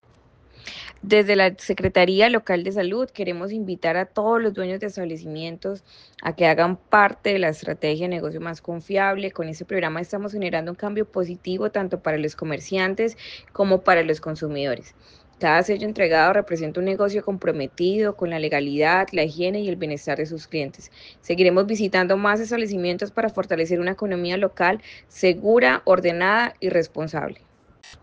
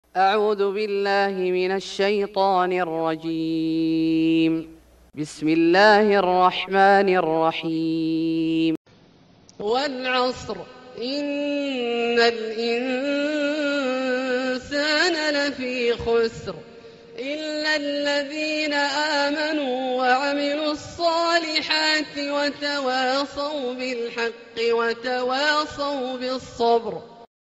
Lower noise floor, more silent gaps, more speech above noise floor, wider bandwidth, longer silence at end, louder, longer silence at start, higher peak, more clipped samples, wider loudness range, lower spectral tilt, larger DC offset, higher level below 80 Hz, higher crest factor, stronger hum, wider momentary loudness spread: about the same, -55 dBFS vs -53 dBFS; second, none vs 8.77-8.85 s; about the same, 33 dB vs 31 dB; second, 8.6 kHz vs 9.6 kHz; about the same, 0.1 s vs 0.15 s; about the same, -22 LUFS vs -22 LUFS; first, 0.6 s vs 0.15 s; about the same, -4 dBFS vs -4 dBFS; neither; about the same, 5 LU vs 6 LU; about the same, -5.5 dB/octave vs -4.5 dB/octave; neither; about the same, -56 dBFS vs -58 dBFS; about the same, 18 dB vs 18 dB; neither; first, 13 LU vs 9 LU